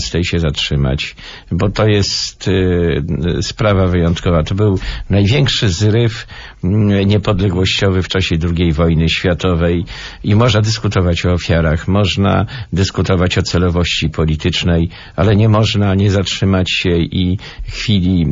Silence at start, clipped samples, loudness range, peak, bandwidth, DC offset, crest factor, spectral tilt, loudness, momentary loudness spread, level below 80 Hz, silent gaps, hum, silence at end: 0 s; under 0.1%; 1 LU; -2 dBFS; 7.6 kHz; under 0.1%; 12 dB; -6 dB/octave; -14 LUFS; 6 LU; -28 dBFS; none; none; 0 s